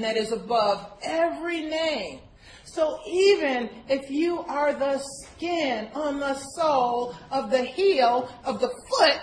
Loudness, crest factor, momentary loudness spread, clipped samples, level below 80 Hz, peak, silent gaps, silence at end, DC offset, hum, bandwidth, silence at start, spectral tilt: -25 LUFS; 18 dB; 10 LU; under 0.1%; -58 dBFS; -6 dBFS; none; 0 s; under 0.1%; none; 10.5 kHz; 0 s; -3.5 dB/octave